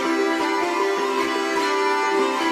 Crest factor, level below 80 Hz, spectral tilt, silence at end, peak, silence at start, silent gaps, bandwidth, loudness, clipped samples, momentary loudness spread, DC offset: 12 dB; -68 dBFS; -2 dB/octave; 0 s; -10 dBFS; 0 s; none; 15.5 kHz; -21 LUFS; under 0.1%; 2 LU; under 0.1%